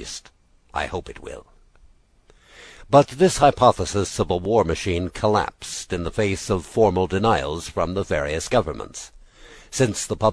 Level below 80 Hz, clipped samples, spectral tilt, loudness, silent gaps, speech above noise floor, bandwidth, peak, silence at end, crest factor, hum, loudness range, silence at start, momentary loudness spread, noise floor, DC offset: -42 dBFS; under 0.1%; -5 dB/octave; -21 LUFS; none; 34 dB; 11 kHz; -2 dBFS; 0 s; 22 dB; none; 4 LU; 0 s; 18 LU; -55 dBFS; under 0.1%